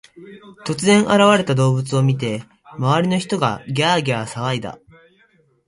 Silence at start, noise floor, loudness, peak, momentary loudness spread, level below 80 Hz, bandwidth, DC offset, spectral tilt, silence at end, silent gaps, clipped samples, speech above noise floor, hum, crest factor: 0.15 s; -58 dBFS; -18 LUFS; 0 dBFS; 13 LU; -56 dBFS; 11.5 kHz; under 0.1%; -5.5 dB/octave; 0.9 s; none; under 0.1%; 40 dB; none; 18 dB